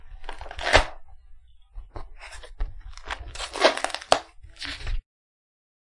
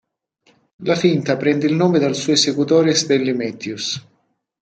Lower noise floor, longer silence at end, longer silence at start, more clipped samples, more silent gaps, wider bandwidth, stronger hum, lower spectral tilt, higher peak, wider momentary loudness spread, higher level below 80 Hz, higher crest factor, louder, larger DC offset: second, -47 dBFS vs -66 dBFS; first, 1 s vs 0.6 s; second, 0 s vs 0.8 s; neither; neither; first, 11.5 kHz vs 9 kHz; neither; second, -2.5 dB/octave vs -4.5 dB/octave; about the same, 0 dBFS vs -2 dBFS; first, 22 LU vs 10 LU; first, -36 dBFS vs -64 dBFS; first, 28 dB vs 16 dB; second, -25 LUFS vs -17 LUFS; neither